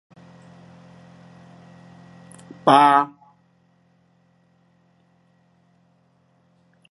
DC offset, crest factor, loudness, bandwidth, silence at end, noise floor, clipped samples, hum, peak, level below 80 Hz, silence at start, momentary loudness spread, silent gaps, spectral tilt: under 0.1%; 24 dB; -17 LUFS; 11.5 kHz; 3.85 s; -62 dBFS; under 0.1%; none; -2 dBFS; -72 dBFS; 2.65 s; 32 LU; none; -5.5 dB/octave